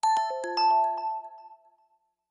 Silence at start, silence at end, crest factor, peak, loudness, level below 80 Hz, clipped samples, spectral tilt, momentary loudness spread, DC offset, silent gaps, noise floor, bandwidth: 0.05 s; 0.75 s; 12 dB; -16 dBFS; -27 LUFS; -88 dBFS; under 0.1%; -0.5 dB/octave; 14 LU; under 0.1%; none; -70 dBFS; 11 kHz